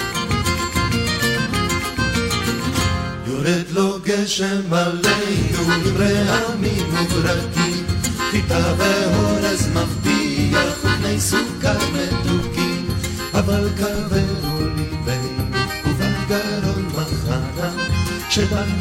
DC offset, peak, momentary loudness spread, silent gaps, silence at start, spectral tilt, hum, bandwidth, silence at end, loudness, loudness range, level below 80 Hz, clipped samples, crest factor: under 0.1%; -4 dBFS; 5 LU; none; 0 s; -4.5 dB/octave; none; 16.5 kHz; 0 s; -19 LUFS; 3 LU; -34 dBFS; under 0.1%; 16 dB